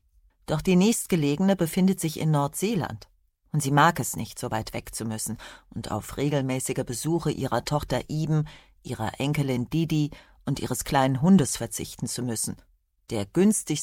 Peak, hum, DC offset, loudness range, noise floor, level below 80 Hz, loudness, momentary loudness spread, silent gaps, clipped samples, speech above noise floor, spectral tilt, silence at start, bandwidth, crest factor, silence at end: -6 dBFS; none; under 0.1%; 4 LU; -47 dBFS; -50 dBFS; -26 LUFS; 12 LU; none; under 0.1%; 21 dB; -5.5 dB/octave; 0.5 s; 17 kHz; 20 dB; 0 s